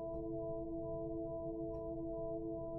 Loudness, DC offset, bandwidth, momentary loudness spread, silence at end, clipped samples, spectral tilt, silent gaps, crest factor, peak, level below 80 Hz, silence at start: -43 LUFS; under 0.1%; 1.4 kHz; 1 LU; 0 s; under 0.1%; -14 dB/octave; none; 10 dB; -32 dBFS; -56 dBFS; 0 s